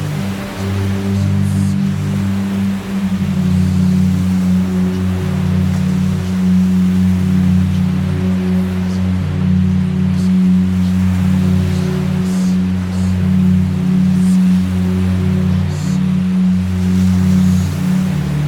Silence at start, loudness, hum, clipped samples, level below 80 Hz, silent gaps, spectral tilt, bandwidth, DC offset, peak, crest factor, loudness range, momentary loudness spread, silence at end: 0 s; -15 LUFS; none; under 0.1%; -38 dBFS; none; -7.5 dB/octave; 13 kHz; under 0.1%; -2 dBFS; 10 dB; 1 LU; 5 LU; 0 s